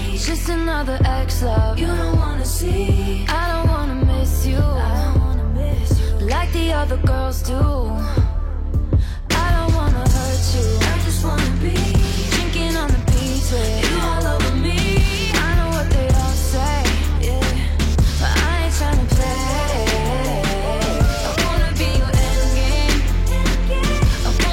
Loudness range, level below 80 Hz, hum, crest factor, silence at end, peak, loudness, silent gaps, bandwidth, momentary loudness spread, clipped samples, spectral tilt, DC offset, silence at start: 1 LU; -20 dBFS; none; 12 dB; 0 s; -6 dBFS; -19 LUFS; none; 16.5 kHz; 3 LU; under 0.1%; -5 dB/octave; under 0.1%; 0 s